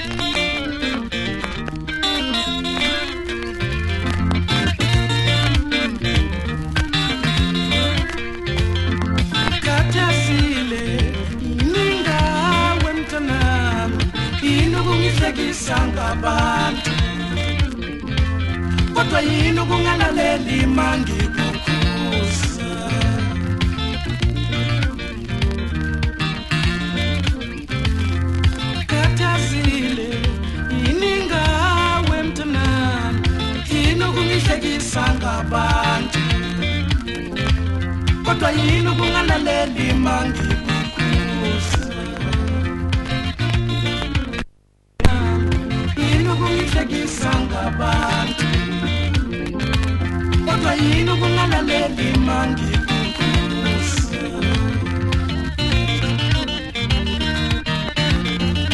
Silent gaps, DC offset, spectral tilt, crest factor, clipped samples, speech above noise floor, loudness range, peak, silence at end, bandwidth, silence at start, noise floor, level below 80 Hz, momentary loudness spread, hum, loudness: none; under 0.1%; -5 dB/octave; 18 dB; under 0.1%; 37 dB; 3 LU; 0 dBFS; 0 s; 11.5 kHz; 0 s; -55 dBFS; -26 dBFS; 6 LU; none; -19 LUFS